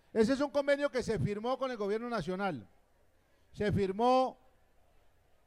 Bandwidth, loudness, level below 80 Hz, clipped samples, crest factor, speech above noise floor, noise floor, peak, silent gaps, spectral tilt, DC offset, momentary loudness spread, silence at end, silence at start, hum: 12.5 kHz; -32 LUFS; -60 dBFS; under 0.1%; 18 dB; 36 dB; -68 dBFS; -16 dBFS; none; -6.5 dB/octave; under 0.1%; 8 LU; 1.15 s; 0.15 s; none